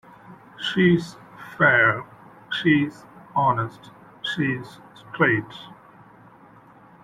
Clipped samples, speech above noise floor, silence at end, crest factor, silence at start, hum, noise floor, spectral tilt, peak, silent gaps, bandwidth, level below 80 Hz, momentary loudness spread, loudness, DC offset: under 0.1%; 28 dB; 1.3 s; 20 dB; 0.3 s; none; -50 dBFS; -6.5 dB/octave; -4 dBFS; none; 12 kHz; -60 dBFS; 22 LU; -22 LUFS; under 0.1%